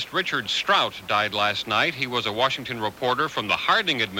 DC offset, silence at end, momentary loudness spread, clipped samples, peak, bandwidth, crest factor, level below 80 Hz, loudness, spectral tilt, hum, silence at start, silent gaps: under 0.1%; 0 s; 5 LU; under 0.1%; -6 dBFS; 17 kHz; 18 dB; -60 dBFS; -23 LUFS; -3 dB/octave; none; 0 s; none